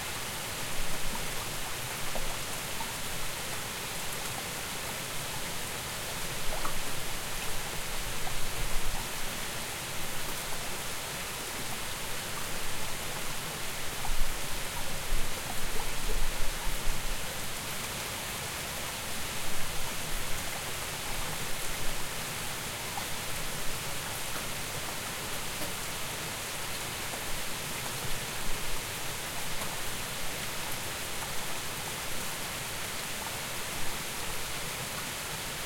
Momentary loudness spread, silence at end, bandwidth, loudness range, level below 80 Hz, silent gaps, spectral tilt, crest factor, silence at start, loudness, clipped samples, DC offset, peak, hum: 1 LU; 0 s; 17 kHz; 0 LU; -40 dBFS; none; -2 dB/octave; 18 dB; 0 s; -35 LUFS; under 0.1%; under 0.1%; -12 dBFS; none